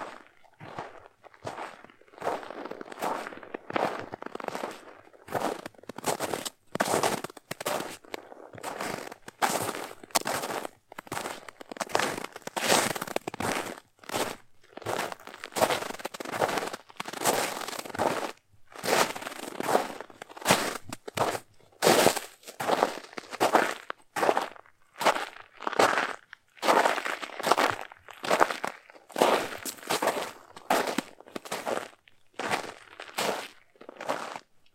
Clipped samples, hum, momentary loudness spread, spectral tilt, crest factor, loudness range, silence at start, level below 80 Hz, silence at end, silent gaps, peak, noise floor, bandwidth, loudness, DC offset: under 0.1%; none; 18 LU; -2.5 dB/octave; 30 dB; 8 LU; 0 s; -70 dBFS; 0.35 s; none; 0 dBFS; -57 dBFS; 17 kHz; -30 LUFS; under 0.1%